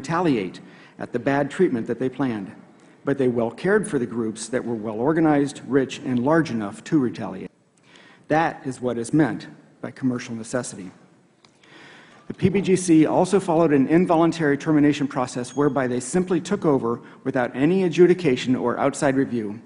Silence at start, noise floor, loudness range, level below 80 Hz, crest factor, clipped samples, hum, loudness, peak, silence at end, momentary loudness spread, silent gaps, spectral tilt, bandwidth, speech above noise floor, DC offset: 0 s; -56 dBFS; 7 LU; -56 dBFS; 18 dB; under 0.1%; none; -22 LUFS; -4 dBFS; 0.05 s; 14 LU; none; -6.5 dB/octave; 11 kHz; 35 dB; under 0.1%